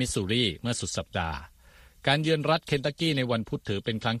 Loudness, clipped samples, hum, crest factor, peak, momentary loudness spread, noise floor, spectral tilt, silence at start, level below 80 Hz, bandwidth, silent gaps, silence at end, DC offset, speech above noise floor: -28 LUFS; under 0.1%; none; 20 dB; -8 dBFS; 7 LU; -55 dBFS; -4.5 dB/octave; 0 s; -50 dBFS; 14 kHz; none; 0 s; under 0.1%; 27 dB